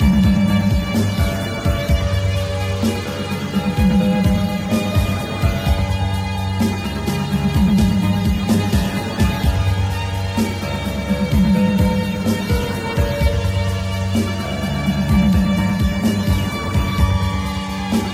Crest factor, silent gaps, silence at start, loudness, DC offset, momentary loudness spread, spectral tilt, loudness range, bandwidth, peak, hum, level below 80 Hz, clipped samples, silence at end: 14 dB; none; 0 s; -19 LUFS; under 0.1%; 6 LU; -6.5 dB/octave; 1 LU; 16 kHz; -2 dBFS; none; -26 dBFS; under 0.1%; 0 s